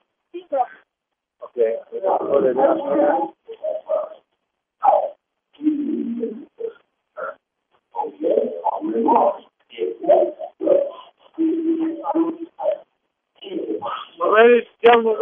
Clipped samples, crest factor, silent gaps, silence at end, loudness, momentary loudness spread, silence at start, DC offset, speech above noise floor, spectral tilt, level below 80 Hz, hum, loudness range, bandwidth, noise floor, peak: under 0.1%; 20 dB; none; 0 s; -20 LUFS; 18 LU; 0.35 s; under 0.1%; 61 dB; -2.5 dB/octave; -82 dBFS; none; 5 LU; 3.7 kHz; -80 dBFS; -2 dBFS